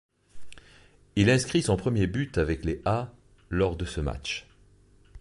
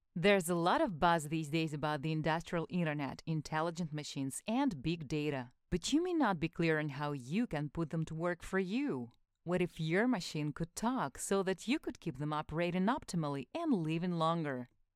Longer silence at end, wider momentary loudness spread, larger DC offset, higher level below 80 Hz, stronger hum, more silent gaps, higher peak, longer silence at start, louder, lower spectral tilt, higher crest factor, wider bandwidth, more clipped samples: second, 0 s vs 0.3 s; first, 11 LU vs 8 LU; neither; first, -42 dBFS vs -60 dBFS; neither; neither; first, -8 dBFS vs -16 dBFS; first, 0.35 s vs 0.15 s; first, -27 LUFS vs -36 LUFS; about the same, -5.5 dB/octave vs -5.5 dB/octave; about the same, 20 dB vs 20 dB; second, 11.5 kHz vs 14.5 kHz; neither